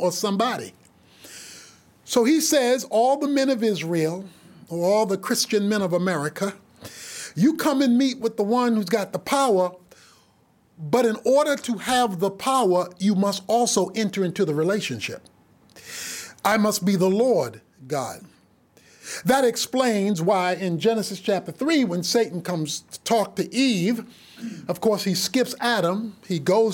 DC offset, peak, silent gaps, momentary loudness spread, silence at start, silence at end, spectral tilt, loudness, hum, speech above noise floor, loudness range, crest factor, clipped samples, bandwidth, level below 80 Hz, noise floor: under 0.1%; -6 dBFS; none; 14 LU; 0 s; 0 s; -4.5 dB/octave; -22 LUFS; none; 38 dB; 2 LU; 16 dB; under 0.1%; 17 kHz; -68 dBFS; -60 dBFS